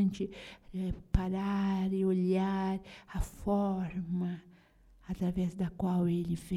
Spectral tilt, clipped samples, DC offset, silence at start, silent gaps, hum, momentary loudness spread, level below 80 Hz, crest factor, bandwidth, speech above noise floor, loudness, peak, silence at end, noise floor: -8 dB/octave; under 0.1%; under 0.1%; 0 s; none; none; 10 LU; -44 dBFS; 20 dB; 12.5 kHz; 29 dB; -34 LUFS; -14 dBFS; 0 s; -61 dBFS